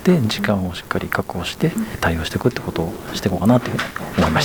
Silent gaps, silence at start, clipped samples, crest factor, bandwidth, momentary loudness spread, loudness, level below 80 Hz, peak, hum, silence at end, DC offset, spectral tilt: none; 0 s; under 0.1%; 16 dB; over 20 kHz; 8 LU; -21 LUFS; -38 dBFS; -2 dBFS; none; 0 s; 0.3%; -6 dB/octave